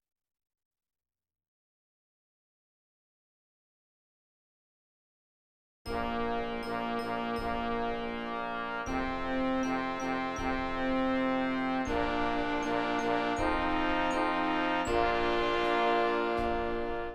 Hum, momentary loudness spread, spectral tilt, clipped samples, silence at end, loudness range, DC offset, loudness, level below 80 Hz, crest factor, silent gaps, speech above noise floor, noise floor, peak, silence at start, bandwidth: none; 6 LU; -5 dB/octave; under 0.1%; 0 s; 9 LU; under 0.1%; -31 LUFS; -48 dBFS; 18 dB; none; over 57 dB; under -90 dBFS; -16 dBFS; 5.85 s; 13 kHz